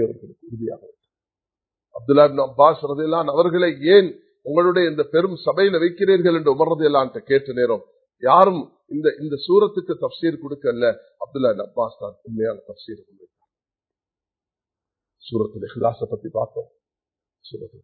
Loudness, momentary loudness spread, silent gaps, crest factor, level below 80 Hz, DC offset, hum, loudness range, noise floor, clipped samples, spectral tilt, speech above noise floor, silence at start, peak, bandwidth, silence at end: -19 LUFS; 18 LU; none; 20 dB; -64 dBFS; under 0.1%; none; 13 LU; under -90 dBFS; under 0.1%; -10 dB/octave; over 71 dB; 0 s; 0 dBFS; 4.6 kHz; 0.15 s